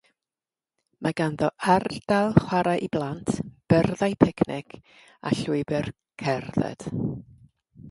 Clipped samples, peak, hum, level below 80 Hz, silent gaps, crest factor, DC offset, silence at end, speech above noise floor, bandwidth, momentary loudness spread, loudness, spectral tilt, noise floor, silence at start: under 0.1%; 0 dBFS; none; -52 dBFS; none; 26 dB; under 0.1%; 0 s; over 65 dB; 11.5 kHz; 10 LU; -25 LUFS; -7 dB/octave; under -90 dBFS; 1 s